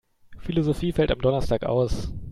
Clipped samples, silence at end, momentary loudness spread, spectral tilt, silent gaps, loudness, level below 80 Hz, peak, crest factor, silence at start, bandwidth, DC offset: under 0.1%; 0 s; 7 LU; -7.5 dB/octave; none; -25 LUFS; -36 dBFS; -8 dBFS; 16 dB; 0.3 s; 13.5 kHz; under 0.1%